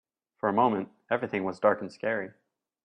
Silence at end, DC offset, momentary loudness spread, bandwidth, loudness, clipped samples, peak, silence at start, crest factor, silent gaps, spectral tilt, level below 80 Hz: 0.55 s; under 0.1%; 8 LU; 9.6 kHz; -29 LUFS; under 0.1%; -10 dBFS; 0.45 s; 20 dB; none; -7.5 dB/octave; -74 dBFS